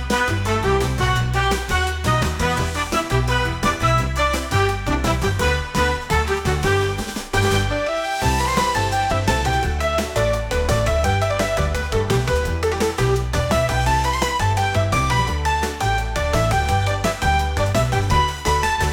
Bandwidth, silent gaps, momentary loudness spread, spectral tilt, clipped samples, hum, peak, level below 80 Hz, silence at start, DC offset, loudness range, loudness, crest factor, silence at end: 19 kHz; none; 2 LU; -4.5 dB/octave; under 0.1%; none; -4 dBFS; -28 dBFS; 0 s; under 0.1%; 1 LU; -20 LUFS; 16 dB; 0 s